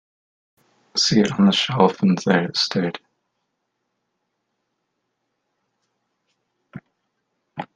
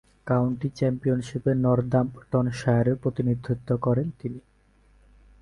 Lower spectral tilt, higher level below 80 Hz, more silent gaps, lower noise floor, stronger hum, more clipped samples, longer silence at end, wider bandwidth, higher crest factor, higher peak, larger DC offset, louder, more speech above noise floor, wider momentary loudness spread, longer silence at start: second, -5 dB/octave vs -8.5 dB/octave; second, -62 dBFS vs -52 dBFS; neither; first, -76 dBFS vs -60 dBFS; second, none vs 50 Hz at -50 dBFS; neither; second, 0.1 s vs 1.05 s; second, 9.2 kHz vs 10.5 kHz; first, 24 dB vs 16 dB; first, 0 dBFS vs -8 dBFS; neither; first, -19 LUFS vs -25 LUFS; first, 57 dB vs 35 dB; first, 15 LU vs 6 LU; first, 0.95 s vs 0.25 s